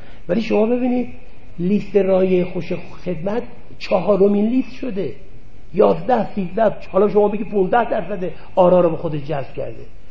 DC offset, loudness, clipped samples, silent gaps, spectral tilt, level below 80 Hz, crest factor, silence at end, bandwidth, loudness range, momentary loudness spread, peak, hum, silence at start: 5%; -19 LUFS; under 0.1%; none; -9 dB/octave; -46 dBFS; 18 dB; 0.1 s; 7 kHz; 3 LU; 12 LU; 0 dBFS; none; 0.25 s